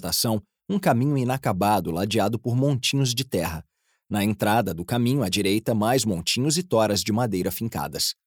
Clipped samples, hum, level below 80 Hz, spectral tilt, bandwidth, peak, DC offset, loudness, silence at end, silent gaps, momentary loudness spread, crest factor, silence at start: under 0.1%; none; -56 dBFS; -4.5 dB/octave; over 20 kHz; -6 dBFS; under 0.1%; -24 LUFS; 0.15 s; none; 6 LU; 16 dB; 0 s